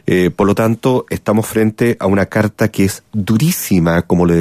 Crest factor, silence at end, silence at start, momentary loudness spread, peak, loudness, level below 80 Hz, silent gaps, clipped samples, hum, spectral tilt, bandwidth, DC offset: 14 dB; 0 s; 0.05 s; 4 LU; 0 dBFS; -15 LUFS; -44 dBFS; none; under 0.1%; none; -6.5 dB/octave; 15.5 kHz; under 0.1%